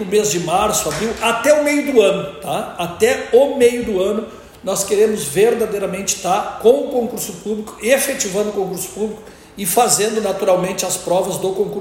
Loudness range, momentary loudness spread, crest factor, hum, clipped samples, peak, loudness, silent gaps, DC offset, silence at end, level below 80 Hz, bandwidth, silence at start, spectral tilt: 3 LU; 10 LU; 16 dB; none; under 0.1%; 0 dBFS; -17 LUFS; none; under 0.1%; 0 s; -48 dBFS; 17 kHz; 0 s; -3.5 dB/octave